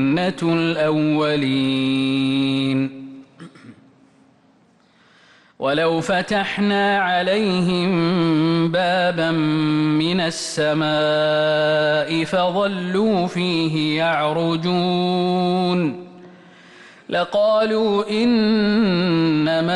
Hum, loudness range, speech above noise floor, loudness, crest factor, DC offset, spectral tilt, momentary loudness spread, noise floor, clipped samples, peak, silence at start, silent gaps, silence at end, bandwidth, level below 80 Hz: none; 6 LU; 37 dB; -19 LUFS; 10 dB; under 0.1%; -6 dB/octave; 4 LU; -56 dBFS; under 0.1%; -10 dBFS; 0 s; none; 0 s; 11.5 kHz; -56 dBFS